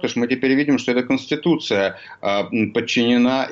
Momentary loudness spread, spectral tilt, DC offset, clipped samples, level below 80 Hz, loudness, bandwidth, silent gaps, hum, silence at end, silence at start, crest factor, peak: 5 LU; -5 dB/octave; under 0.1%; under 0.1%; -62 dBFS; -19 LUFS; 7.6 kHz; none; none; 0 s; 0 s; 12 dB; -8 dBFS